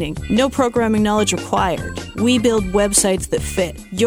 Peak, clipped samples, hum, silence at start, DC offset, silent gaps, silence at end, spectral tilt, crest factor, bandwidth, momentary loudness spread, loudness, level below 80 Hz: 0 dBFS; under 0.1%; none; 0 s; under 0.1%; none; 0 s; -4 dB/octave; 16 dB; 19.5 kHz; 7 LU; -17 LUFS; -34 dBFS